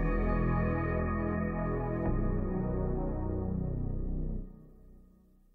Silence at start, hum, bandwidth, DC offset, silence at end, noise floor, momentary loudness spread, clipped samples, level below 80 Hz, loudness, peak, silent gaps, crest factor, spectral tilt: 0 s; none; 3.1 kHz; under 0.1%; 0.55 s; -61 dBFS; 7 LU; under 0.1%; -36 dBFS; -34 LUFS; -18 dBFS; none; 14 dB; -12 dB/octave